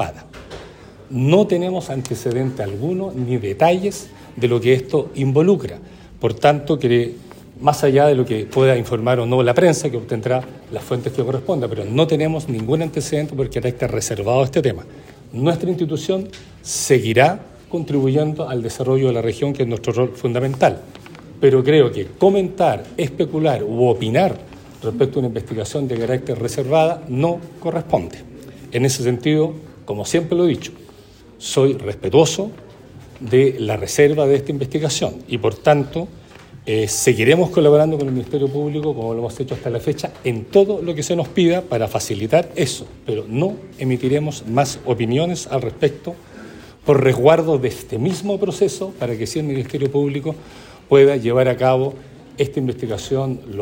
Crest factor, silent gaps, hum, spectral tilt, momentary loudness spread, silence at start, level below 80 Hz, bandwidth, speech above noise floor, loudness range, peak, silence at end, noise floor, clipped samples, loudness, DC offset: 18 dB; none; none; -6 dB/octave; 12 LU; 0 s; -48 dBFS; 16.5 kHz; 26 dB; 4 LU; 0 dBFS; 0 s; -44 dBFS; under 0.1%; -18 LUFS; under 0.1%